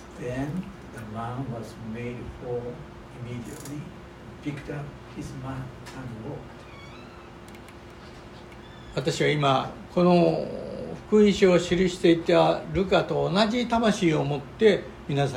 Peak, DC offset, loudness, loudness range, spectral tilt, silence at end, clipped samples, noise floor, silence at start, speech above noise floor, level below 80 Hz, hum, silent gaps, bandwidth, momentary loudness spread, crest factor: -6 dBFS; under 0.1%; -25 LUFS; 17 LU; -6 dB/octave; 0 s; under 0.1%; -44 dBFS; 0 s; 19 dB; -50 dBFS; none; none; 15.5 kHz; 23 LU; 20 dB